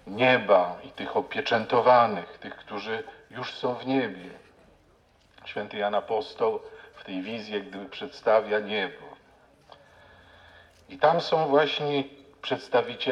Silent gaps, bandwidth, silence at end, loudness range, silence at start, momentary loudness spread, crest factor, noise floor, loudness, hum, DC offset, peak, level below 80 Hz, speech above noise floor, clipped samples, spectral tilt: none; 9 kHz; 0 s; 7 LU; 0.05 s; 18 LU; 22 dB; -61 dBFS; -26 LUFS; none; under 0.1%; -6 dBFS; -68 dBFS; 35 dB; under 0.1%; -6 dB/octave